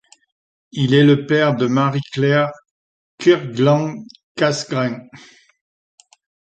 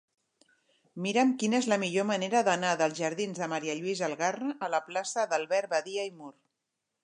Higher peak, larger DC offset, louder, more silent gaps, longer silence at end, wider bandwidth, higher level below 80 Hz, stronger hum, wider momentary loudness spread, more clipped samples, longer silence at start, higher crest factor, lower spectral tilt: first, -2 dBFS vs -12 dBFS; neither; first, -17 LUFS vs -30 LUFS; first, 2.71-3.18 s, 4.23-4.35 s vs none; first, 1.35 s vs 0.75 s; second, 8.8 kHz vs 11 kHz; first, -62 dBFS vs -84 dBFS; neither; first, 13 LU vs 9 LU; neither; second, 0.75 s vs 0.95 s; about the same, 16 dB vs 18 dB; first, -6.5 dB/octave vs -4 dB/octave